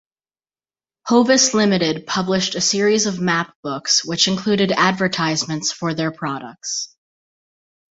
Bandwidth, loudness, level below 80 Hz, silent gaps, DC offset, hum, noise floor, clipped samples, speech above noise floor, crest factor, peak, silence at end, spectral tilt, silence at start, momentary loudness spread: 8 kHz; -18 LUFS; -58 dBFS; 3.55-3.63 s; under 0.1%; none; under -90 dBFS; under 0.1%; over 71 dB; 18 dB; -2 dBFS; 1.05 s; -3 dB/octave; 1.05 s; 12 LU